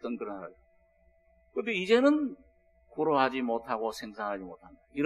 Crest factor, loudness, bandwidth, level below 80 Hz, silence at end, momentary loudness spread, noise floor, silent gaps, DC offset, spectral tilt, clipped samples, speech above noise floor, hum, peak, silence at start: 20 dB; -30 LUFS; 13 kHz; -66 dBFS; 0 s; 19 LU; -66 dBFS; none; under 0.1%; -5.5 dB/octave; under 0.1%; 36 dB; none; -10 dBFS; 0.05 s